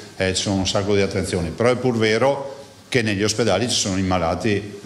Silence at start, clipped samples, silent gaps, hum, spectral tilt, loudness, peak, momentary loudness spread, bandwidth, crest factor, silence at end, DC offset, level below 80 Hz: 0 s; under 0.1%; none; none; -4.5 dB/octave; -20 LUFS; -4 dBFS; 5 LU; 13.5 kHz; 16 dB; 0 s; under 0.1%; -46 dBFS